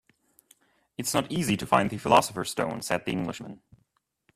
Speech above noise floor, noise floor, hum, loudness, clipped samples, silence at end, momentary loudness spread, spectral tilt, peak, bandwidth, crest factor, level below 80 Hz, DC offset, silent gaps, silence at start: 47 dB; -74 dBFS; none; -27 LUFS; under 0.1%; 0.8 s; 14 LU; -4.5 dB/octave; -4 dBFS; 15.5 kHz; 24 dB; -58 dBFS; under 0.1%; none; 1 s